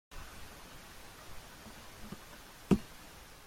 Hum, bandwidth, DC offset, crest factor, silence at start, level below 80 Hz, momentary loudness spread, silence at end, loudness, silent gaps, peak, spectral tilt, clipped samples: none; 16.5 kHz; under 0.1%; 30 dB; 0.1 s; -54 dBFS; 19 LU; 0 s; -41 LUFS; none; -12 dBFS; -6 dB/octave; under 0.1%